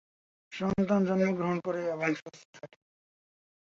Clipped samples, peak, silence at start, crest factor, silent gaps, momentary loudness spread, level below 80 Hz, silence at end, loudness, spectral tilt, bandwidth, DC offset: under 0.1%; -14 dBFS; 0.5 s; 18 dB; 2.22-2.26 s, 2.45-2.53 s; 23 LU; -62 dBFS; 1.1 s; -30 LUFS; -7.5 dB/octave; 7.4 kHz; under 0.1%